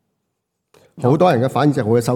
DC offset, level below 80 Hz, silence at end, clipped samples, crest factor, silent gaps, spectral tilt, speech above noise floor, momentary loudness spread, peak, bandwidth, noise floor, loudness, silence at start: under 0.1%; -64 dBFS; 0 s; under 0.1%; 16 dB; none; -7.5 dB/octave; 60 dB; 4 LU; -2 dBFS; 17 kHz; -75 dBFS; -16 LUFS; 0.95 s